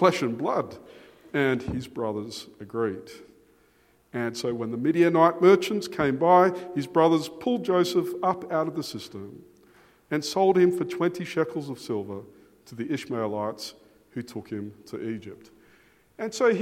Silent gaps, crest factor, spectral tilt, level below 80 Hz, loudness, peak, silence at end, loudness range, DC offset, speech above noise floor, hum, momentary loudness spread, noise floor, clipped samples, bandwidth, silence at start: none; 22 dB; -6 dB/octave; -62 dBFS; -25 LUFS; -6 dBFS; 0 s; 12 LU; under 0.1%; 37 dB; none; 19 LU; -62 dBFS; under 0.1%; 15.5 kHz; 0 s